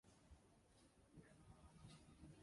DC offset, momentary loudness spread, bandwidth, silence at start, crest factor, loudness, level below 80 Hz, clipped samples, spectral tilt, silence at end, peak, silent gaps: under 0.1%; 4 LU; 11.5 kHz; 0.05 s; 16 dB; -67 LUFS; -74 dBFS; under 0.1%; -5.5 dB/octave; 0 s; -50 dBFS; none